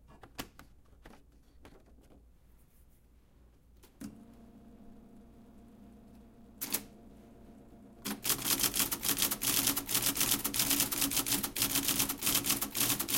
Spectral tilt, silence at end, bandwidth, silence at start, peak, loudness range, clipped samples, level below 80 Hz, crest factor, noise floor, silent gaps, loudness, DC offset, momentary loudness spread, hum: -1 dB/octave; 0 s; 17 kHz; 0.1 s; -10 dBFS; 16 LU; under 0.1%; -58 dBFS; 26 dB; -62 dBFS; none; -30 LUFS; under 0.1%; 19 LU; none